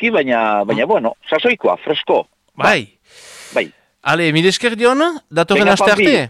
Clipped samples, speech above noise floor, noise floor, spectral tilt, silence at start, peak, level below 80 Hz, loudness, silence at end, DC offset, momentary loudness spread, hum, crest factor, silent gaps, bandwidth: under 0.1%; 25 dB; -40 dBFS; -4.5 dB/octave; 0 s; -4 dBFS; -54 dBFS; -15 LUFS; 0 s; under 0.1%; 10 LU; none; 12 dB; none; 14.5 kHz